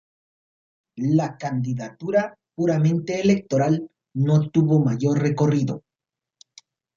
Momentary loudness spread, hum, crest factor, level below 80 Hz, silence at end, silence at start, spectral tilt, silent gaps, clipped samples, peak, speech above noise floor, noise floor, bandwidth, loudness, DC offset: 9 LU; none; 16 dB; -62 dBFS; 1.2 s; 0.95 s; -8 dB/octave; none; under 0.1%; -6 dBFS; 67 dB; -88 dBFS; 7.4 kHz; -22 LUFS; under 0.1%